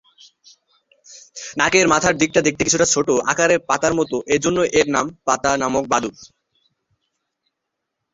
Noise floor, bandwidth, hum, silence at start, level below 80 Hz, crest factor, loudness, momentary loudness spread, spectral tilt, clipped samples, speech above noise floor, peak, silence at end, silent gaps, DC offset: -79 dBFS; 8 kHz; none; 1.1 s; -52 dBFS; 18 dB; -17 LUFS; 6 LU; -3 dB/octave; under 0.1%; 61 dB; -2 dBFS; 1.85 s; none; under 0.1%